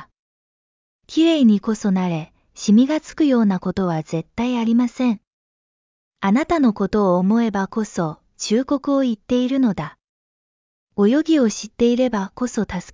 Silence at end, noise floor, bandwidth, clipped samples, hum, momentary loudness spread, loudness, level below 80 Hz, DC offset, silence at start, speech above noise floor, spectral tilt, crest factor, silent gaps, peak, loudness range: 0.05 s; under -90 dBFS; 7.6 kHz; under 0.1%; none; 10 LU; -19 LUFS; -50 dBFS; under 0.1%; 0 s; over 72 dB; -6 dB/octave; 14 dB; 0.19-0.99 s, 5.27-6.11 s, 10.09-10.87 s; -6 dBFS; 3 LU